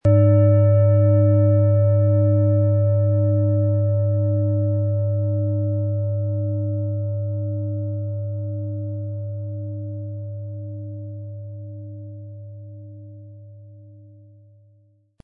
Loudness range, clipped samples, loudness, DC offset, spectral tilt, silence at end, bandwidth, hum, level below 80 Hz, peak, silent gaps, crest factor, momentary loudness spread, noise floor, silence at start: 20 LU; under 0.1%; -20 LUFS; under 0.1%; -13.5 dB/octave; 1.25 s; 2.4 kHz; none; -56 dBFS; -6 dBFS; none; 14 dB; 20 LU; -58 dBFS; 0.05 s